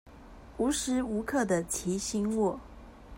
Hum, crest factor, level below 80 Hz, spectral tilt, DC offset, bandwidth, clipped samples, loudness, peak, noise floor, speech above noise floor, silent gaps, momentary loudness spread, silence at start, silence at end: none; 16 dB; -52 dBFS; -4.5 dB/octave; under 0.1%; 16 kHz; under 0.1%; -30 LUFS; -16 dBFS; -50 dBFS; 20 dB; none; 11 LU; 0.05 s; 0 s